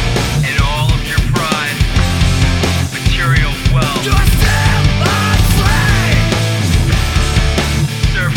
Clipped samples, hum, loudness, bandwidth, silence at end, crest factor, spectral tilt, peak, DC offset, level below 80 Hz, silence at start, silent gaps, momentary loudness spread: under 0.1%; none; -13 LUFS; 18.5 kHz; 0 s; 12 dB; -4.5 dB/octave; 0 dBFS; under 0.1%; -18 dBFS; 0 s; none; 3 LU